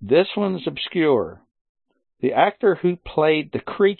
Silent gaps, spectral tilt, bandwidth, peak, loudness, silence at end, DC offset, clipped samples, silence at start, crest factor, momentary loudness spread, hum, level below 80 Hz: 1.61-1.75 s; -11 dB/octave; 4.4 kHz; -4 dBFS; -21 LUFS; 0.05 s; under 0.1%; under 0.1%; 0 s; 18 dB; 8 LU; none; -54 dBFS